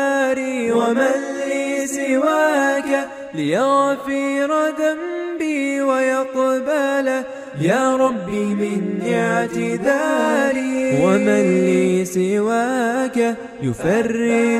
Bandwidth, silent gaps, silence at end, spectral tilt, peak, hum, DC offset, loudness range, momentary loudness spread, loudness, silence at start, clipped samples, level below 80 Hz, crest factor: 15.5 kHz; none; 0 s; -5.5 dB/octave; -4 dBFS; none; under 0.1%; 2 LU; 6 LU; -19 LUFS; 0 s; under 0.1%; -58 dBFS; 14 dB